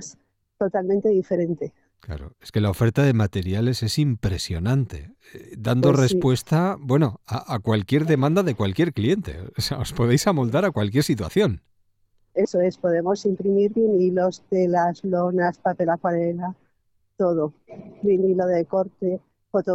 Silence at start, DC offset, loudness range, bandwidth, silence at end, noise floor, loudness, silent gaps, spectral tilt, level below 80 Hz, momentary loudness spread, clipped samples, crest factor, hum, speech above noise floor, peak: 0 s; under 0.1%; 3 LU; 16 kHz; 0 s; -68 dBFS; -22 LUFS; none; -6.5 dB/octave; -48 dBFS; 10 LU; under 0.1%; 18 dB; none; 46 dB; -4 dBFS